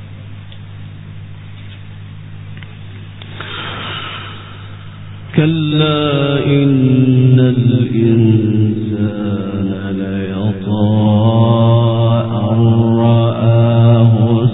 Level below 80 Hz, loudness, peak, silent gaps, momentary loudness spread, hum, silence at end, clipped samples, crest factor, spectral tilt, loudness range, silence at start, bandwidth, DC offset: -46 dBFS; -13 LUFS; 0 dBFS; none; 22 LU; none; 0 s; under 0.1%; 14 dB; -7.5 dB/octave; 16 LU; 0 s; 4 kHz; 0.6%